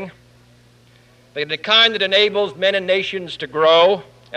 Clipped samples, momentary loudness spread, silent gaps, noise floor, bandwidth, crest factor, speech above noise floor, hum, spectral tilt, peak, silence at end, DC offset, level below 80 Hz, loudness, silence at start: under 0.1%; 14 LU; none; -51 dBFS; 9.8 kHz; 16 dB; 34 dB; none; -3.5 dB/octave; -2 dBFS; 0 s; under 0.1%; -62 dBFS; -16 LUFS; 0 s